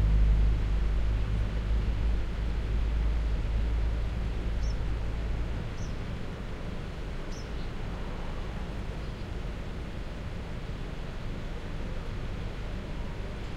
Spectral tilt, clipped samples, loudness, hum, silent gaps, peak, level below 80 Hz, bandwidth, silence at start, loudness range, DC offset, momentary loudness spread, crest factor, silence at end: -7 dB/octave; under 0.1%; -34 LUFS; none; none; -14 dBFS; -32 dBFS; 8 kHz; 0 s; 7 LU; under 0.1%; 8 LU; 16 dB; 0 s